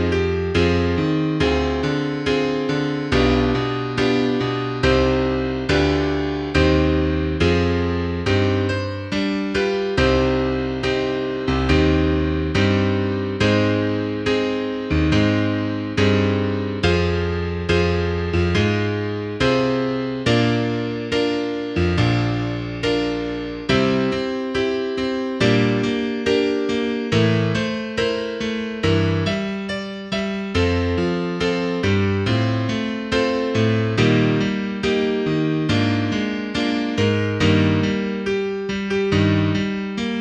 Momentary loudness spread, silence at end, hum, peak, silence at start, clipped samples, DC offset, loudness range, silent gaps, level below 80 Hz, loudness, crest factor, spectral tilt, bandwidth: 6 LU; 0 s; none; -4 dBFS; 0 s; under 0.1%; under 0.1%; 2 LU; none; -34 dBFS; -20 LUFS; 16 dB; -6.5 dB/octave; 9.4 kHz